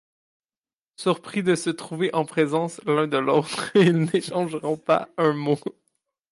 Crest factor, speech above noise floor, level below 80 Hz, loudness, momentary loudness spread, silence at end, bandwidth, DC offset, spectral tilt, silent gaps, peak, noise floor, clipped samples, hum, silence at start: 16 dB; over 67 dB; -72 dBFS; -23 LUFS; 8 LU; 0.6 s; 11.5 kHz; under 0.1%; -6 dB/octave; none; -8 dBFS; under -90 dBFS; under 0.1%; none; 1 s